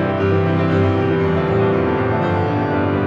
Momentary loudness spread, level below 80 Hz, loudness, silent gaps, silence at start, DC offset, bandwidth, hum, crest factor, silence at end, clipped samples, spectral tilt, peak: 2 LU; -42 dBFS; -17 LUFS; none; 0 s; under 0.1%; 6.6 kHz; none; 12 dB; 0 s; under 0.1%; -9 dB/octave; -4 dBFS